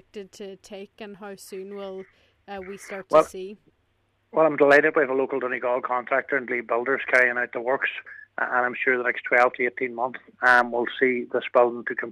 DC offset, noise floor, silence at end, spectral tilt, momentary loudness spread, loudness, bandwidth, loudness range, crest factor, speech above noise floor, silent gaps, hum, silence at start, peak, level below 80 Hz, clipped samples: under 0.1%; -69 dBFS; 0 s; -4.5 dB/octave; 21 LU; -22 LUFS; 14 kHz; 7 LU; 18 dB; 45 dB; none; none; 0.15 s; -6 dBFS; -68 dBFS; under 0.1%